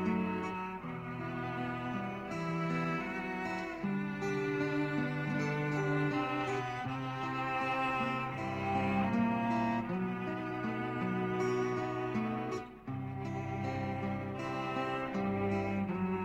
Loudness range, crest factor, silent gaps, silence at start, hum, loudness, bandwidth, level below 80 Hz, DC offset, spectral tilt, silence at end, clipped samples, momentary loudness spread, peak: 4 LU; 14 dB; none; 0 s; none; -35 LUFS; 11 kHz; -62 dBFS; under 0.1%; -7 dB/octave; 0 s; under 0.1%; 6 LU; -20 dBFS